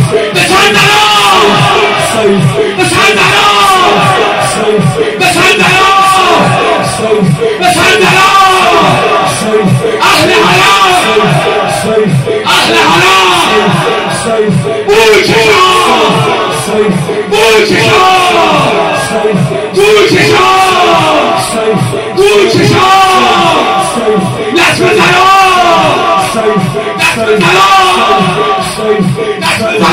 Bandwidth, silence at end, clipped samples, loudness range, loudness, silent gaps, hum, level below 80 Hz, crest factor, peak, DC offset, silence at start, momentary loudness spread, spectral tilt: 16.5 kHz; 0 s; 1%; 1 LU; -6 LUFS; none; none; -38 dBFS; 6 dB; 0 dBFS; 0.2%; 0 s; 6 LU; -4 dB/octave